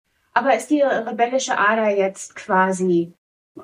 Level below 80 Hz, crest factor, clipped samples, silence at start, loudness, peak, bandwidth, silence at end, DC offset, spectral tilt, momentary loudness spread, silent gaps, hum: -70 dBFS; 18 dB; under 0.1%; 0.35 s; -19 LUFS; -2 dBFS; 15 kHz; 0 s; under 0.1%; -4.5 dB/octave; 6 LU; 3.18-3.55 s; none